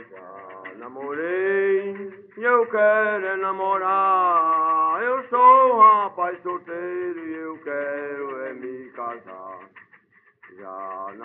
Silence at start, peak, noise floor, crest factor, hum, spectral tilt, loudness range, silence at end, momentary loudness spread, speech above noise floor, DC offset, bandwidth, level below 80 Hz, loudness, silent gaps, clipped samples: 0 s; -2 dBFS; -57 dBFS; 20 dB; none; -3 dB/octave; 15 LU; 0 s; 23 LU; 35 dB; under 0.1%; 3.9 kHz; -80 dBFS; -20 LUFS; none; under 0.1%